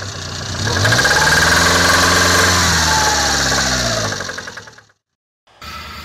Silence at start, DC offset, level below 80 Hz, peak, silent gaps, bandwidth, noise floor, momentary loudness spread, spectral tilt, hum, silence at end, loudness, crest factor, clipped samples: 0 s; under 0.1%; -32 dBFS; -6 dBFS; 5.15-5.47 s; 16 kHz; -44 dBFS; 15 LU; -2 dB/octave; none; 0 s; -12 LUFS; 10 dB; under 0.1%